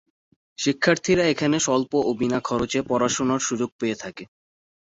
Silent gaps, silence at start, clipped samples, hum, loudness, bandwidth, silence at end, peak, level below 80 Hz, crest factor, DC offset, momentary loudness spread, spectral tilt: 3.72-3.79 s; 0.6 s; under 0.1%; none; -23 LUFS; 8 kHz; 0.6 s; -4 dBFS; -54 dBFS; 20 dB; under 0.1%; 8 LU; -4 dB/octave